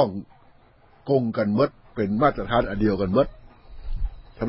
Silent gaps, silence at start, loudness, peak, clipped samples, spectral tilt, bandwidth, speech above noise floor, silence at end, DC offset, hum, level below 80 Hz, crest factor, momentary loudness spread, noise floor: none; 0 s; -24 LUFS; -4 dBFS; under 0.1%; -11.5 dB/octave; 5.8 kHz; 32 dB; 0 s; under 0.1%; none; -38 dBFS; 20 dB; 15 LU; -55 dBFS